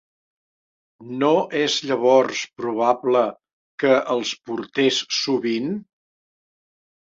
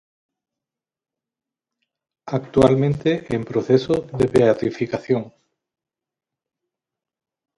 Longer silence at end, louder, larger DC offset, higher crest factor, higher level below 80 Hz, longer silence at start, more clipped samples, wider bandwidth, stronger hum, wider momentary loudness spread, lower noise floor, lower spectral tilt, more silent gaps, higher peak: second, 1.2 s vs 2.3 s; about the same, -21 LUFS vs -20 LUFS; neither; about the same, 20 dB vs 22 dB; second, -70 dBFS vs -50 dBFS; second, 1 s vs 2.25 s; neither; second, 7.8 kHz vs 11.5 kHz; neither; about the same, 10 LU vs 10 LU; about the same, under -90 dBFS vs -88 dBFS; second, -3.5 dB/octave vs -7.5 dB/octave; first, 3.53-3.78 s vs none; about the same, -2 dBFS vs 0 dBFS